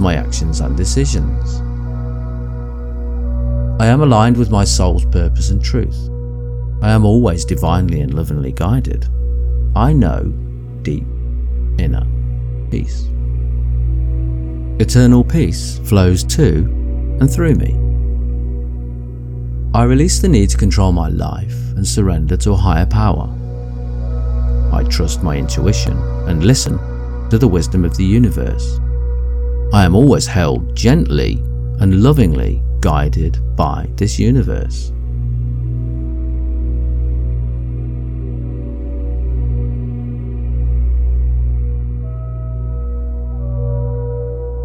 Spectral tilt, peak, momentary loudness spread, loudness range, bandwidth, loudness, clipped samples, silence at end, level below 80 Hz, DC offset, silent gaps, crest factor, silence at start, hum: -6.5 dB/octave; 0 dBFS; 12 LU; 7 LU; 14 kHz; -16 LUFS; under 0.1%; 0 s; -18 dBFS; under 0.1%; none; 14 dB; 0 s; 60 Hz at -20 dBFS